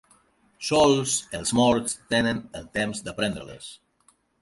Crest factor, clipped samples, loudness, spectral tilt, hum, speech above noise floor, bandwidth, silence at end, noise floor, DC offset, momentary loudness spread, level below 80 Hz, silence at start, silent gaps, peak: 18 dB; under 0.1%; -24 LUFS; -3.5 dB/octave; none; 40 dB; 11.5 kHz; 0.65 s; -64 dBFS; under 0.1%; 16 LU; -52 dBFS; 0.6 s; none; -8 dBFS